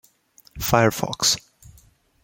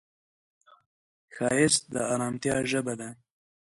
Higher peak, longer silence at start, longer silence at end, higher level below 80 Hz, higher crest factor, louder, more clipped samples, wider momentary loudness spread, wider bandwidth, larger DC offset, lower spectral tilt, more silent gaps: first, -2 dBFS vs -10 dBFS; second, 0.55 s vs 1.3 s; about the same, 0.55 s vs 0.55 s; first, -48 dBFS vs -64 dBFS; about the same, 22 dB vs 22 dB; first, -21 LUFS vs -27 LUFS; neither; second, 7 LU vs 12 LU; first, 17 kHz vs 11.5 kHz; neither; about the same, -3 dB/octave vs -3.5 dB/octave; neither